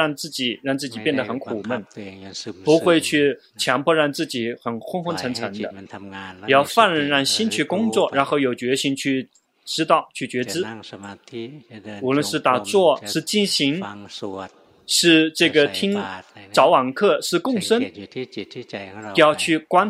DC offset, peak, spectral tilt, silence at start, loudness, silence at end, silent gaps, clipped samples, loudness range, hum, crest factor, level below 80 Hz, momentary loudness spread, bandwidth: under 0.1%; 0 dBFS; -3.5 dB/octave; 0 s; -20 LUFS; 0 s; none; under 0.1%; 5 LU; none; 20 dB; -68 dBFS; 18 LU; 16 kHz